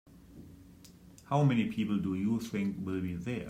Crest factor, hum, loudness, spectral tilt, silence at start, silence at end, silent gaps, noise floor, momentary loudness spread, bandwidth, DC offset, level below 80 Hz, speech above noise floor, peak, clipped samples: 18 dB; none; -32 LUFS; -7.5 dB/octave; 0.1 s; 0 s; none; -55 dBFS; 20 LU; 15.5 kHz; under 0.1%; -62 dBFS; 24 dB; -14 dBFS; under 0.1%